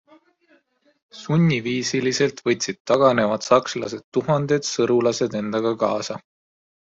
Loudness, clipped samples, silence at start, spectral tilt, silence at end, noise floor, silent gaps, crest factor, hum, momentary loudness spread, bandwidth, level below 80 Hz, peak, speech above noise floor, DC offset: -21 LUFS; under 0.1%; 1.15 s; -5 dB/octave; 0.8 s; -62 dBFS; 2.80-2.85 s, 4.04-4.12 s; 18 dB; none; 9 LU; 7.8 kHz; -62 dBFS; -4 dBFS; 41 dB; under 0.1%